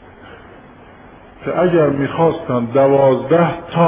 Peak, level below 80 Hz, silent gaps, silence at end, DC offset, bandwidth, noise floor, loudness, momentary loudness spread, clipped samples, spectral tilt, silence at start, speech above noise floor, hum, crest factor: -2 dBFS; -48 dBFS; none; 0 s; under 0.1%; 3.9 kHz; -41 dBFS; -15 LUFS; 7 LU; under 0.1%; -11.5 dB/octave; 0.25 s; 27 dB; none; 14 dB